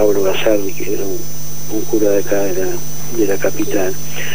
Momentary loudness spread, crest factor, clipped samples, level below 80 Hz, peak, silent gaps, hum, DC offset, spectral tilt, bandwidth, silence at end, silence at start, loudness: 8 LU; 16 dB; under 0.1%; -44 dBFS; 0 dBFS; none; 50 Hz at -35 dBFS; 20%; -4.5 dB/octave; 16 kHz; 0 s; 0 s; -18 LUFS